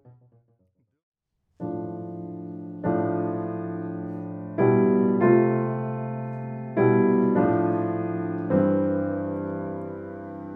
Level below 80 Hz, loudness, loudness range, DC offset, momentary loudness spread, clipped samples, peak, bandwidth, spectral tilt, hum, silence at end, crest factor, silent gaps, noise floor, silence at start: -66 dBFS; -25 LUFS; 9 LU; under 0.1%; 16 LU; under 0.1%; -6 dBFS; 3.6 kHz; -12.5 dB/octave; none; 0 s; 18 dB; 1.03-1.12 s; -69 dBFS; 0.05 s